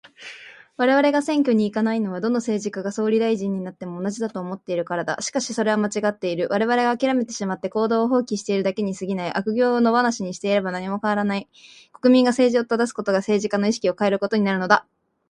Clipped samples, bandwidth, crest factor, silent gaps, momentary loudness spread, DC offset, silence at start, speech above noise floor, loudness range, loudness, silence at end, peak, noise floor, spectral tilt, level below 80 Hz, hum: under 0.1%; 11.5 kHz; 22 dB; none; 9 LU; under 0.1%; 0.2 s; 21 dB; 4 LU; -22 LUFS; 0.5 s; 0 dBFS; -42 dBFS; -5 dB/octave; -66 dBFS; none